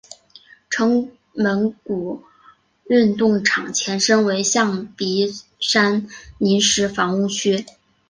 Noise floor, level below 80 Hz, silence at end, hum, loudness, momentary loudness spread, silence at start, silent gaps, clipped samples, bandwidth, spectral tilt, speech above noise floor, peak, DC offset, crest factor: -53 dBFS; -56 dBFS; 0.45 s; none; -19 LUFS; 10 LU; 0.7 s; none; under 0.1%; 10 kHz; -3.5 dB/octave; 34 dB; -2 dBFS; under 0.1%; 18 dB